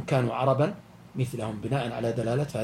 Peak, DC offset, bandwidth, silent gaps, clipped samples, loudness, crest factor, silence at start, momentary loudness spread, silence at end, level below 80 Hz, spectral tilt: -10 dBFS; under 0.1%; 13.5 kHz; none; under 0.1%; -28 LUFS; 18 dB; 0 s; 8 LU; 0 s; -58 dBFS; -7 dB/octave